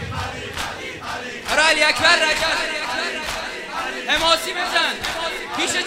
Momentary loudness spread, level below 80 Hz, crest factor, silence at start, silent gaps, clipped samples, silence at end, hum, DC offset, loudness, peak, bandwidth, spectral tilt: 13 LU; -44 dBFS; 22 dB; 0 s; none; under 0.1%; 0 s; none; under 0.1%; -19 LUFS; 0 dBFS; 16 kHz; -1.5 dB/octave